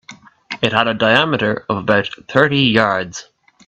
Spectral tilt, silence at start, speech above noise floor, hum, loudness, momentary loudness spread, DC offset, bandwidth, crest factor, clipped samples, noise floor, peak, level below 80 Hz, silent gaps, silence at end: -5 dB/octave; 0.1 s; 22 dB; none; -15 LUFS; 10 LU; under 0.1%; 8.4 kHz; 16 dB; under 0.1%; -38 dBFS; 0 dBFS; -52 dBFS; none; 0.45 s